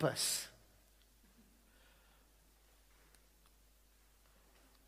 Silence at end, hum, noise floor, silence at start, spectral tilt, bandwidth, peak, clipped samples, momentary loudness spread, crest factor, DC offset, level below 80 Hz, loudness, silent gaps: 4.35 s; none; -69 dBFS; 0 s; -2.5 dB/octave; 15.5 kHz; -20 dBFS; under 0.1%; 31 LU; 26 dB; under 0.1%; -70 dBFS; -37 LUFS; none